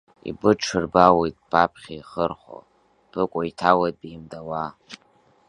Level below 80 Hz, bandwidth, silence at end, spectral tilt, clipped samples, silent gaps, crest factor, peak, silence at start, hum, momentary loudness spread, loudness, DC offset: -52 dBFS; 10.5 kHz; 0.55 s; -5.5 dB/octave; under 0.1%; none; 22 dB; 0 dBFS; 0.25 s; none; 21 LU; -22 LUFS; under 0.1%